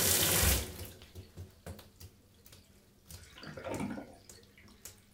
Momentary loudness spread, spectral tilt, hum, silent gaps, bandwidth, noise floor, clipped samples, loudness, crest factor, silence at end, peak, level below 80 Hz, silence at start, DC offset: 29 LU; -2.5 dB/octave; none; none; 17.5 kHz; -62 dBFS; under 0.1%; -31 LUFS; 28 dB; 0.2 s; -10 dBFS; -48 dBFS; 0 s; under 0.1%